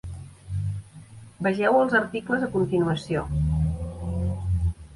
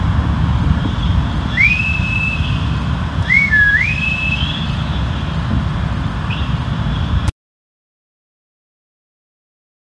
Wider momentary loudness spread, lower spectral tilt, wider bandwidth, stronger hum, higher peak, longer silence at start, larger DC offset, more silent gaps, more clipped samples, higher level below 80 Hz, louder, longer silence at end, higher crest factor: first, 13 LU vs 9 LU; first, -7.5 dB/octave vs -6 dB/octave; first, 11.5 kHz vs 10 kHz; neither; second, -8 dBFS vs 0 dBFS; about the same, 0.05 s vs 0 s; second, under 0.1% vs 0.2%; neither; neither; second, -36 dBFS vs -24 dBFS; second, -25 LUFS vs -16 LUFS; second, 0 s vs 2.7 s; about the same, 16 dB vs 16 dB